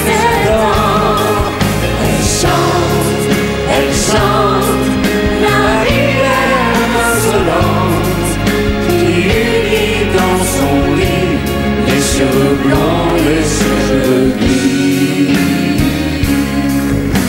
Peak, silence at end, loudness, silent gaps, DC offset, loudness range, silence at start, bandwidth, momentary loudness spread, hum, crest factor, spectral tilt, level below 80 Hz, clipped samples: 0 dBFS; 0 s; -12 LUFS; none; under 0.1%; 1 LU; 0 s; 16.5 kHz; 3 LU; none; 10 dB; -5 dB/octave; -24 dBFS; under 0.1%